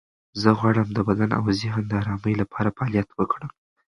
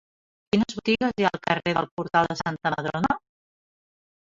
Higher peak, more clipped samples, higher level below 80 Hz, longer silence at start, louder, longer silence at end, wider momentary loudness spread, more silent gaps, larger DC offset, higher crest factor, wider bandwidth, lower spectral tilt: first, -2 dBFS vs -6 dBFS; neither; first, -48 dBFS vs -56 dBFS; second, 0.35 s vs 0.55 s; about the same, -24 LUFS vs -25 LUFS; second, 0.5 s vs 1.15 s; about the same, 6 LU vs 4 LU; second, none vs 1.91-1.97 s; neither; about the same, 22 dB vs 22 dB; first, 11 kHz vs 7.8 kHz; first, -7.5 dB/octave vs -5.5 dB/octave